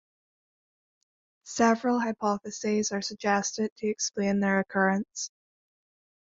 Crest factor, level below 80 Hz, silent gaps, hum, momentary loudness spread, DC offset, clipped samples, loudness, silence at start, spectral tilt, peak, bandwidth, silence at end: 20 dB; -70 dBFS; 3.72-3.76 s; none; 7 LU; under 0.1%; under 0.1%; -28 LUFS; 1.45 s; -4 dB/octave; -10 dBFS; 7.8 kHz; 1.05 s